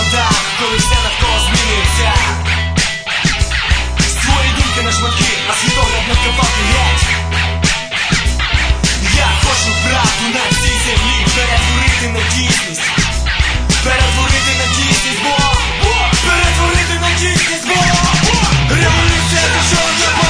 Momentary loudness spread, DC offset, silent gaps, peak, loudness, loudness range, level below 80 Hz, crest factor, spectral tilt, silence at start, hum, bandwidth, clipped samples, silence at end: 3 LU; under 0.1%; none; 0 dBFS; -12 LUFS; 2 LU; -18 dBFS; 12 dB; -3 dB/octave; 0 s; none; 11 kHz; under 0.1%; 0 s